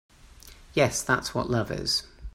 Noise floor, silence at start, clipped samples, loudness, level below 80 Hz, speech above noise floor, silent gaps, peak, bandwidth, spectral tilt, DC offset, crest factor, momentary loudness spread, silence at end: -50 dBFS; 0.25 s; under 0.1%; -26 LUFS; -48 dBFS; 24 dB; none; -8 dBFS; 16 kHz; -3.5 dB/octave; under 0.1%; 22 dB; 4 LU; 0.05 s